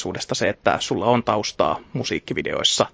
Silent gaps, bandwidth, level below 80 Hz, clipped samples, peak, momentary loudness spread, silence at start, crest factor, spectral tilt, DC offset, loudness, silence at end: none; 8 kHz; -50 dBFS; under 0.1%; -2 dBFS; 7 LU; 0 s; 20 dB; -3.5 dB/octave; under 0.1%; -22 LUFS; 0.05 s